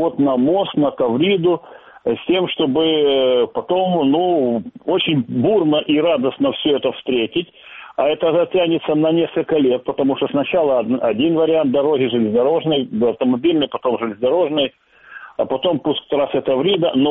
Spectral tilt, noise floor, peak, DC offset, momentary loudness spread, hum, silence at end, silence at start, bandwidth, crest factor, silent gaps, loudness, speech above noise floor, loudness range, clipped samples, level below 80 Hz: -4 dB/octave; -40 dBFS; -4 dBFS; under 0.1%; 5 LU; none; 0 s; 0 s; 4 kHz; 14 dB; none; -17 LUFS; 23 dB; 2 LU; under 0.1%; -58 dBFS